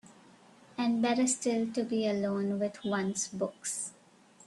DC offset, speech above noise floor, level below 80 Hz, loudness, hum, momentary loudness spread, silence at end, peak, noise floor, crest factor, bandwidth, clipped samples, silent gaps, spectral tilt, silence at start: under 0.1%; 29 dB; -76 dBFS; -32 LUFS; none; 7 LU; 0.55 s; -18 dBFS; -60 dBFS; 16 dB; 12.5 kHz; under 0.1%; none; -4 dB/octave; 0.05 s